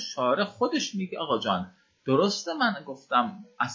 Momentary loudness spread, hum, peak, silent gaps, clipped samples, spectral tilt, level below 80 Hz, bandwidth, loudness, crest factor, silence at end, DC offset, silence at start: 9 LU; none; -10 dBFS; none; under 0.1%; -4.5 dB/octave; -68 dBFS; 7.6 kHz; -27 LUFS; 18 dB; 0 s; under 0.1%; 0 s